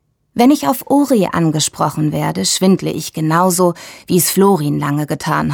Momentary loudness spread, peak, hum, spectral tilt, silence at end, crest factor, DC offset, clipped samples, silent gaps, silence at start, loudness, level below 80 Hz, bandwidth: 6 LU; -2 dBFS; none; -5 dB/octave; 0 s; 12 dB; under 0.1%; under 0.1%; none; 0.35 s; -14 LUFS; -50 dBFS; over 20 kHz